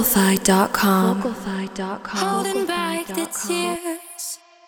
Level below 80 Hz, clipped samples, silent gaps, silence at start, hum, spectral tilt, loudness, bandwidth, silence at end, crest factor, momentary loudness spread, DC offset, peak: -52 dBFS; under 0.1%; none; 0 s; none; -4 dB/octave; -21 LUFS; over 20 kHz; 0.3 s; 20 dB; 13 LU; under 0.1%; 0 dBFS